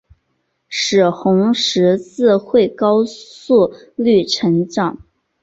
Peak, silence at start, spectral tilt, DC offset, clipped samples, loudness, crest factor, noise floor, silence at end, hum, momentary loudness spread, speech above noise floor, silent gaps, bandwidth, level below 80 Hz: -2 dBFS; 0.7 s; -5.5 dB/octave; under 0.1%; under 0.1%; -15 LUFS; 14 dB; -68 dBFS; 0.45 s; none; 6 LU; 53 dB; none; 8 kHz; -56 dBFS